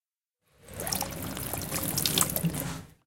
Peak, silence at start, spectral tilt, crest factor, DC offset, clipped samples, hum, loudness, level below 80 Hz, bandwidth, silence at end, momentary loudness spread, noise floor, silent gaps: -6 dBFS; 0.6 s; -3 dB/octave; 26 dB; 0.1%; under 0.1%; none; -29 LUFS; -50 dBFS; 17 kHz; 0.1 s; 12 LU; -78 dBFS; none